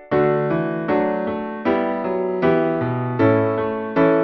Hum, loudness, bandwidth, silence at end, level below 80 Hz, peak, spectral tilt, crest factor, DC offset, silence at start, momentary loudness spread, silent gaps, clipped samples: none; -20 LUFS; 5.8 kHz; 0 s; -52 dBFS; -6 dBFS; -10 dB/octave; 14 dB; under 0.1%; 0 s; 5 LU; none; under 0.1%